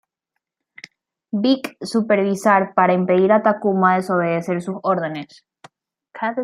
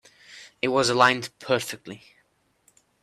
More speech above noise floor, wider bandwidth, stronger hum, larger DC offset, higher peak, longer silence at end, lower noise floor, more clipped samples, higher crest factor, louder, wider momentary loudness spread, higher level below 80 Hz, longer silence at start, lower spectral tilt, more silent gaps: first, 61 dB vs 43 dB; about the same, 14 kHz vs 14.5 kHz; neither; neither; about the same, -2 dBFS vs -4 dBFS; second, 0 s vs 1.05 s; first, -80 dBFS vs -67 dBFS; neither; second, 18 dB vs 24 dB; first, -18 LUFS vs -23 LUFS; second, 9 LU vs 26 LU; about the same, -68 dBFS vs -68 dBFS; first, 1.35 s vs 0.3 s; first, -6.5 dB/octave vs -3.5 dB/octave; neither